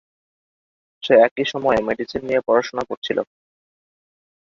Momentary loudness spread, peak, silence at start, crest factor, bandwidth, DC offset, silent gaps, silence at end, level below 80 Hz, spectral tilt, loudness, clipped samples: 12 LU; -2 dBFS; 1.05 s; 20 dB; 7.2 kHz; under 0.1%; 1.31-1.36 s, 2.97-3.02 s; 1.25 s; -56 dBFS; -5 dB/octave; -19 LUFS; under 0.1%